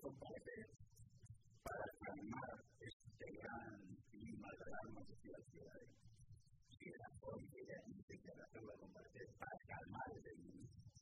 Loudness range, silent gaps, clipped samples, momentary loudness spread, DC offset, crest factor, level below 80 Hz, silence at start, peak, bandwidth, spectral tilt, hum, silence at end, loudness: 4 LU; 2.93-3.00 s, 8.03-8.08 s; under 0.1%; 13 LU; under 0.1%; 22 dB; -74 dBFS; 0 s; -34 dBFS; 11 kHz; -6.5 dB/octave; none; 0 s; -57 LUFS